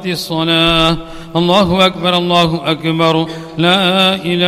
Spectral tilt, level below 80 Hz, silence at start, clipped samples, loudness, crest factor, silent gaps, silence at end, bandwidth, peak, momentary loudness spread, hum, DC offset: -5.5 dB/octave; -36 dBFS; 0 s; under 0.1%; -12 LUFS; 12 dB; none; 0 s; 15.5 kHz; 0 dBFS; 7 LU; none; under 0.1%